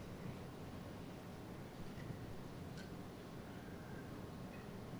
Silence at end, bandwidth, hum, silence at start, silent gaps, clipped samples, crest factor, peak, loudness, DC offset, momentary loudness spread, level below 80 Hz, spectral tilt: 0 s; over 20 kHz; none; 0 s; none; under 0.1%; 14 dB; -36 dBFS; -51 LUFS; under 0.1%; 2 LU; -62 dBFS; -6.5 dB/octave